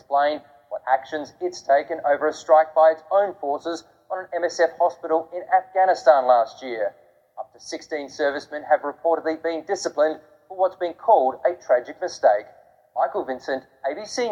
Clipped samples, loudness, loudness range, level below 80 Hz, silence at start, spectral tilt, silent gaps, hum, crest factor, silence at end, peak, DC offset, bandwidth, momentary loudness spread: under 0.1%; -22 LUFS; 4 LU; -72 dBFS; 0.1 s; -3 dB/octave; none; none; 20 dB; 0 s; -4 dBFS; under 0.1%; 10 kHz; 15 LU